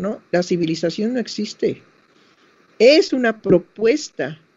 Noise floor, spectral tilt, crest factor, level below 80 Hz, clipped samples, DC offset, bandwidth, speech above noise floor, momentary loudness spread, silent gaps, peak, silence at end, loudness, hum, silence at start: -55 dBFS; -5 dB/octave; 18 dB; -58 dBFS; under 0.1%; under 0.1%; 8 kHz; 37 dB; 12 LU; none; 0 dBFS; 0.2 s; -19 LUFS; none; 0 s